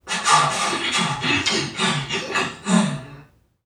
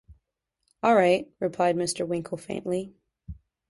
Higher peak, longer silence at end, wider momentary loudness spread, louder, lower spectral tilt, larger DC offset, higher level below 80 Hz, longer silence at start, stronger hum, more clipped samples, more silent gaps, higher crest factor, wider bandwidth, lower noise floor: first, -2 dBFS vs -8 dBFS; about the same, 0.45 s vs 0.35 s; second, 7 LU vs 24 LU; first, -20 LUFS vs -26 LUFS; second, -3 dB/octave vs -5 dB/octave; neither; about the same, -56 dBFS vs -56 dBFS; about the same, 0.05 s vs 0.1 s; neither; neither; neither; about the same, 20 dB vs 18 dB; first, 15 kHz vs 11.5 kHz; second, -49 dBFS vs -78 dBFS